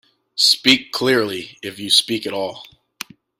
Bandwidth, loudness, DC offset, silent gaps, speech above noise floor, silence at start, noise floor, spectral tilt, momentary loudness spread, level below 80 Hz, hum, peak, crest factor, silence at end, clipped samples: 16 kHz; -16 LUFS; under 0.1%; none; 19 dB; 0.35 s; -38 dBFS; -2 dB/octave; 19 LU; -62 dBFS; none; 0 dBFS; 20 dB; 0.75 s; under 0.1%